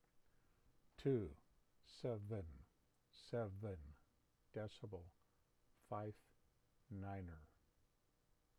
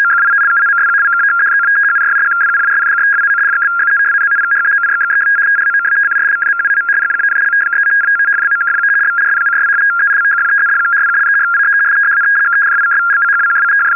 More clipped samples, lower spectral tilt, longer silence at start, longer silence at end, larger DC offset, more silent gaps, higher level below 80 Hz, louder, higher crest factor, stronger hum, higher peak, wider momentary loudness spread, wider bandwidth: neither; first, -8 dB/octave vs -4 dB/octave; first, 0.15 s vs 0 s; first, 1.15 s vs 0 s; second, under 0.1% vs 0.2%; neither; first, -70 dBFS vs -78 dBFS; second, -50 LUFS vs -10 LUFS; first, 20 dB vs 6 dB; neither; second, -30 dBFS vs -6 dBFS; first, 21 LU vs 2 LU; first, 12.5 kHz vs 2.9 kHz